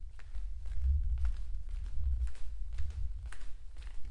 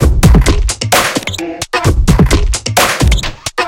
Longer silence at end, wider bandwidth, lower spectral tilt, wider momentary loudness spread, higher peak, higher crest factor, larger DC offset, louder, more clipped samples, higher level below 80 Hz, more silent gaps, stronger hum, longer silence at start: about the same, 0 s vs 0 s; second, 10 kHz vs 17 kHz; first, -6 dB/octave vs -4.5 dB/octave; first, 15 LU vs 9 LU; second, -20 dBFS vs 0 dBFS; about the same, 12 dB vs 10 dB; neither; second, -40 LUFS vs -12 LUFS; second, under 0.1% vs 0.5%; second, -36 dBFS vs -14 dBFS; neither; neither; about the same, 0 s vs 0 s